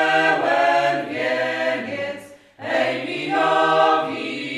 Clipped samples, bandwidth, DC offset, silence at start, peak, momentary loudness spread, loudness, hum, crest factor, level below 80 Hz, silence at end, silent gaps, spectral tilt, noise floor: under 0.1%; 12.5 kHz; under 0.1%; 0 s; -4 dBFS; 11 LU; -20 LUFS; none; 16 dB; -72 dBFS; 0 s; none; -4 dB/octave; -40 dBFS